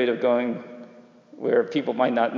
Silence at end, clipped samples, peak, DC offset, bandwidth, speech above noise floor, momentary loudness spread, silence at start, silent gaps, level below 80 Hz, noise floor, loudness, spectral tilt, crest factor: 0 s; under 0.1%; -8 dBFS; under 0.1%; 7 kHz; 26 dB; 16 LU; 0 s; none; -86 dBFS; -49 dBFS; -24 LUFS; -7 dB/octave; 16 dB